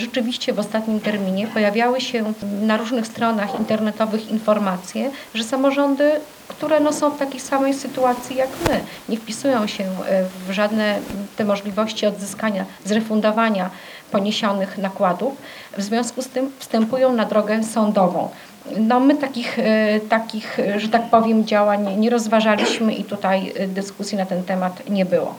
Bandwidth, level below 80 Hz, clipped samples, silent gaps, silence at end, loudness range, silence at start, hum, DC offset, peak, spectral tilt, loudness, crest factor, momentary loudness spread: over 20 kHz; -54 dBFS; under 0.1%; none; 0 s; 4 LU; 0 s; none; under 0.1%; 0 dBFS; -5 dB/octave; -20 LUFS; 20 dB; 8 LU